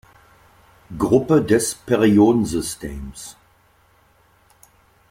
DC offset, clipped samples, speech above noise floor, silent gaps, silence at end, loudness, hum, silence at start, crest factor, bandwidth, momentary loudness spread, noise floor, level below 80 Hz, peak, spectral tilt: under 0.1%; under 0.1%; 39 dB; none; 1.8 s; -18 LUFS; none; 0.9 s; 18 dB; 16.5 kHz; 21 LU; -57 dBFS; -44 dBFS; -2 dBFS; -5.5 dB/octave